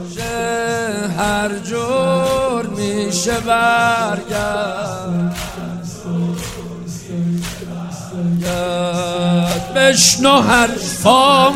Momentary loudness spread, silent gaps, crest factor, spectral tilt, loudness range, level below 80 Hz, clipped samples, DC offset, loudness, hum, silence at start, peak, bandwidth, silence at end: 16 LU; none; 16 dB; -3.5 dB/octave; 9 LU; -40 dBFS; under 0.1%; under 0.1%; -16 LUFS; none; 0 s; 0 dBFS; 16 kHz; 0 s